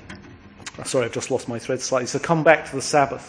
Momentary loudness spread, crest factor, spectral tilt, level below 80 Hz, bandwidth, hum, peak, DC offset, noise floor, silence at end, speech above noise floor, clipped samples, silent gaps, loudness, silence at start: 21 LU; 22 dB; -4 dB/octave; -56 dBFS; 10.5 kHz; none; 0 dBFS; under 0.1%; -44 dBFS; 0 s; 22 dB; under 0.1%; none; -22 LUFS; 0.05 s